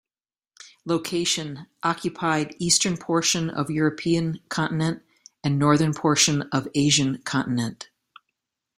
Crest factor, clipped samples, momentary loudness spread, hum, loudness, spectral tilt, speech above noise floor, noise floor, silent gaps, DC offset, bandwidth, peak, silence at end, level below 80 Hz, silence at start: 22 dB; under 0.1%; 9 LU; none; -23 LUFS; -4 dB/octave; over 67 dB; under -90 dBFS; none; under 0.1%; 16 kHz; -4 dBFS; 0.95 s; -60 dBFS; 0.65 s